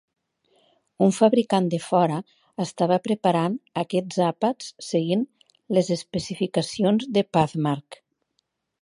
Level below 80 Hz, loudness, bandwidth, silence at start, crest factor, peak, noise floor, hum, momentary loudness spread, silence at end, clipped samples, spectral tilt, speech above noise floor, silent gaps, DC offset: -64 dBFS; -24 LUFS; 11.5 kHz; 1 s; 20 dB; -4 dBFS; -75 dBFS; none; 10 LU; 0.9 s; under 0.1%; -6 dB/octave; 52 dB; none; under 0.1%